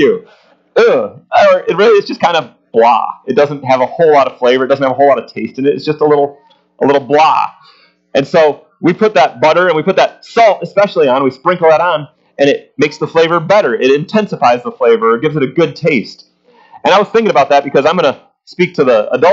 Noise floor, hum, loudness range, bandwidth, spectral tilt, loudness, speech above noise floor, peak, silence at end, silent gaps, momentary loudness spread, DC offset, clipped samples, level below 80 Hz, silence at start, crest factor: -42 dBFS; none; 2 LU; 7.6 kHz; -5.5 dB/octave; -11 LUFS; 31 dB; 0 dBFS; 0 s; none; 7 LU; under 0.1%; under 0.1%; -60 dBFS; 0 s; 12 dB